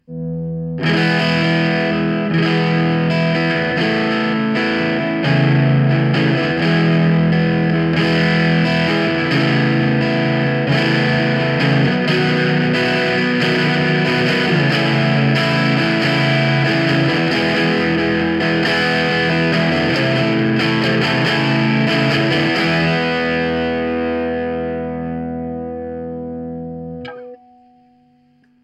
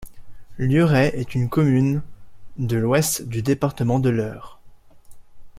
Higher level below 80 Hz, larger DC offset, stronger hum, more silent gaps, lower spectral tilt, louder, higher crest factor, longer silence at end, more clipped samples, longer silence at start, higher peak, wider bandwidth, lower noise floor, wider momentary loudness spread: about the same, -46 dBFS vs -46 dBFS; neither; neither; neither; about the same, -7 dB/octave vs -6 dB/octave; first, -16 LUFS vs -21 LUFS; second, 12 dB vs 18 dB; first, 1.3 s vs 0 s; neither; about the same, 0.1 s vs 0 s; about the same, -4 dBFS vs -4 dBFS; second, 9.8 kHz vs 16 kHz; first, -54 dBFS vs -45 dBFS; about the same, 9 LU vs 11 LU